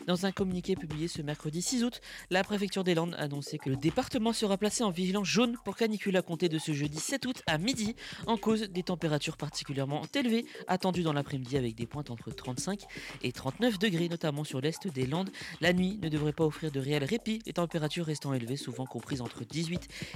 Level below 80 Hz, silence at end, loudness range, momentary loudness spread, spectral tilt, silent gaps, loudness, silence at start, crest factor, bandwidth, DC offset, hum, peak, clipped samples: -58 dBFS; 0 s; 3 LU; 8 LU; -5 dB/octave; none; -32 LUFS; 0 s; 18 dB; 16 kHz; under 0.1%; none; -14 dBFS; under 0.1%